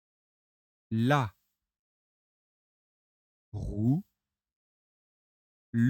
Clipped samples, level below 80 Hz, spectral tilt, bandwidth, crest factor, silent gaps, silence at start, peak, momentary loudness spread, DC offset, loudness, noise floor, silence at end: under 0.1%; -54 dBFS; -8 dB/octave; 15.5 kHz; 24 dB; 1.79-3.52 s, 4.56-5.73 s; 0.9 s; -10 dBFS; 12 LU; under 0.1%; -31 LUFS; under -90 dBFS; 0 s